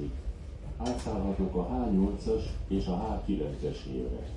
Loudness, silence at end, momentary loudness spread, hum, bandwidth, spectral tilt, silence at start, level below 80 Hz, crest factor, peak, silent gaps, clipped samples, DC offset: -33 LUFS; 0 s; 10 LU; none; 11 kHz; -8 dB/octave; 0 s; -38 dBFS; 14 dB; -18 dBFS; none; under 0.1%; under 0.1%